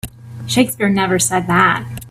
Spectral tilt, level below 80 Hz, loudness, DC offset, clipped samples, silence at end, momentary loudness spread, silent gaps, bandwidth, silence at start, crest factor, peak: -4 dB/octave; -46 dBFS; -15 LUFS; under 0.1%; under 0.1%; 0 s; 12 LU; none; 16 kHz; 0.05 s; 16 dB; 0 dBFS